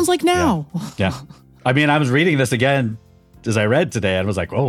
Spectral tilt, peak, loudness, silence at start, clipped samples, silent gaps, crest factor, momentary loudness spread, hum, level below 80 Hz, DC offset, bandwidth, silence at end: -5.5 dB/octave; -2 dBFS; -18 LUFS; 0 s; under 0.1%; none; 16 dB; 11 LU; none; -46 dBFS; under 0.1%; 15.5 kHz; 0 s